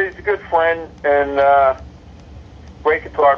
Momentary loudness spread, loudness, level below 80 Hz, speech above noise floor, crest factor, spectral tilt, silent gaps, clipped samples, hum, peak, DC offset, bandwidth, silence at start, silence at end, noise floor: 9 LU; -16 LUFS; -42 dBFS; 23 dB; 16 dB; -6.5 dB/octave; none; under 0.1%; none; -2 dBFS; under 0.1%; 6.6 kHz; 0 s; 0 s; -38 dBFS